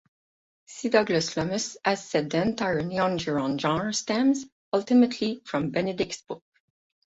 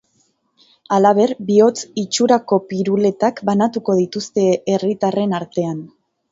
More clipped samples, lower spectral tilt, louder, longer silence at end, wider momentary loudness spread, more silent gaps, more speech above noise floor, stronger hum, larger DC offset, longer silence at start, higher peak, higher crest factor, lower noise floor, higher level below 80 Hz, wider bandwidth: neither; about the same, -4.5 dB/octave vs -5.5 dB/octave; second, -26 LUFS vs -17 LUFS; first, 0.8 s vs 0.45 s; about the same, 8 LU vs 7 LU; first, 4.52-4.72 s vs none; first, over 65 dB vs 46 dB; neither; neither; second, 0.7 s vs 0.9 s; second, -8 dBFS vs 0 dBFS; about the same, 20 dB vs 16 dB; first, under -90 dBFS vs -63 dBFS; about the same, -60 dBFS vs -64 dBFS; about the same, 8 kHz vs 7.8 kHz